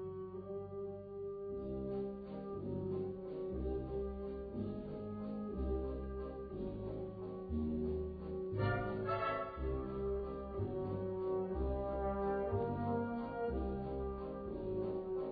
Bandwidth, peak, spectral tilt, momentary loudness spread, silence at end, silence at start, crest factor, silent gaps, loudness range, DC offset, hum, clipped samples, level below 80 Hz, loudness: 4.8 kHz; -26 dBFS; -8 dB/octave; 8 LU; 0 s; 0 s; 14 dB; none; 4 LU; under 0.1%; none; under 0.1%; -50 dBFS; -41 LUFS